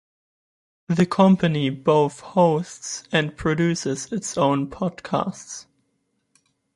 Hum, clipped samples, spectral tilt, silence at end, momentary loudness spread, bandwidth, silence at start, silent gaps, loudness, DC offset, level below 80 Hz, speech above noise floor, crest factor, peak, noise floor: none; under 0.1%; -5.5 dB/octave; 1.15 s; 13 LU; 11.5 kHz; 0.9 s; none; -22 LUFS; under 0.1%; -54 dBFS; 50 dB; 20 dB; -2 dBFS; -72 dBFS